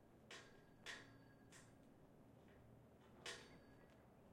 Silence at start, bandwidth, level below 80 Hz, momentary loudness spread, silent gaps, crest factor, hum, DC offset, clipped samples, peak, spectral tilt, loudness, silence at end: 0 s; 16 kHz; -80 dBFS; 13 LU; none; 24 dB; none; under 0.1%; under 0.1%; -40 dBFS; -3 dB/octave; -61 LUFS; 0 s